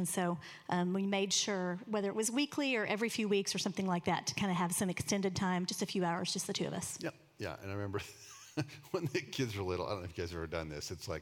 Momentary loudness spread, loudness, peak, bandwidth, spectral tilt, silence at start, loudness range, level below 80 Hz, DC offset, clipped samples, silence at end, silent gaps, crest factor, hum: 9 LU; -36 LUFS; -18 dBFS; 17.5 kHz; -4 dB/octave; 0 s; 6 LU; -68 dBFS; under 0.1%; under 0.1%; 0 s; none; 18 dB; none